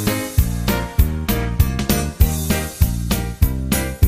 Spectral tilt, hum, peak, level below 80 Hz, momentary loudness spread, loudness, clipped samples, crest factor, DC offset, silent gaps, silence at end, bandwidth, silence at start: -5 dB/octave; none; -2 dBFS; -22 dBFS; 3 LU; -20 LUFS; under 0.1%; 16 dB; under 0.1%; none; 0 s; 15.5 kHz; 0 s